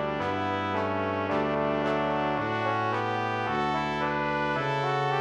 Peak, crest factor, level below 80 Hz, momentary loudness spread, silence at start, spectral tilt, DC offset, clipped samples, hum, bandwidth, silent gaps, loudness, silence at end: -12 dBFS; 16 dB; -56 dBFS; 2 LU; 0 s; -6.5 dB/octave; under 0.1%; under 0.1%; none; 10 kHz; none; -28 LUFS; 0 s